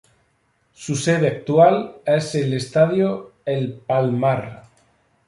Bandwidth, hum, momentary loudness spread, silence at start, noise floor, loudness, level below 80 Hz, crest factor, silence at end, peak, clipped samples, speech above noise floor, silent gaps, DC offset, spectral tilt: 11.5 kHz; none; 11 LU; 0.8 s; -65 dBFS; -20 LUFS; -60 dBFS; 18 dB; 0.65 s; -2 dBFS; under 0.1%; 46 dB; none; under 0.1%; -6 dB/octave